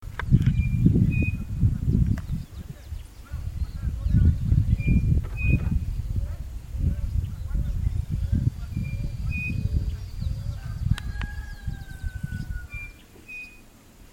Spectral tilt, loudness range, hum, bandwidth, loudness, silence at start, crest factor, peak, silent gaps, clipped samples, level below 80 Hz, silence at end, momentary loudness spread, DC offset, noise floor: -8 dB/octave; 8 LU; none; 16 kHz; -27 LUFS; 0 s; 20 dB; -6 dBFS; none; under 0.1%; -30 dBFS; 0.05 s; 16 LU; under 0.1%; -50 dBFS